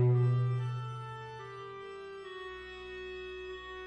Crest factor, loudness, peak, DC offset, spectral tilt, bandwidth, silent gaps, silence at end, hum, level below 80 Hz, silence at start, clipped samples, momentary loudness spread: 16 dB; -37 LUFS; -18 dBFS; under 0.1%; -8.5 dB/octave; 6.2 kHz; none; 0 s; none; -62 dBFS; 0 s; under 0.1%; 15 LU